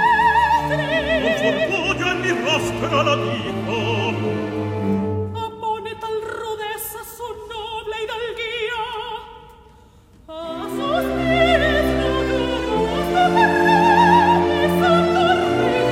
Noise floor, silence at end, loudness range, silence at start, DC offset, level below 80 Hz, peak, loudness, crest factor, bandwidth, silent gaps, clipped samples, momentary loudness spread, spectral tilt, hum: -48 dBFS; 0 s; 11 LU; 0 s; under 0.1%; -38 dBFS; -2 dBFS; -19 LUFS; 18 dB; 16 kHz; none; under 0.1%; 14 LU; -5.5 dB/octave; none